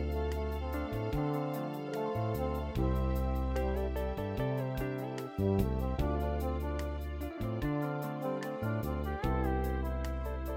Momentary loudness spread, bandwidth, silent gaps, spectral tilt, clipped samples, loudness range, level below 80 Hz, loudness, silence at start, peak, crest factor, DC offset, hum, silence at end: 5 LU; 16.5 kHz; none; -8 dB/octave; under 0.1%; 1 LU; -38 dBFS; -35 LUFS; 0 s; -16 dBFS; 16 dB; under 0.1%; none; 0 s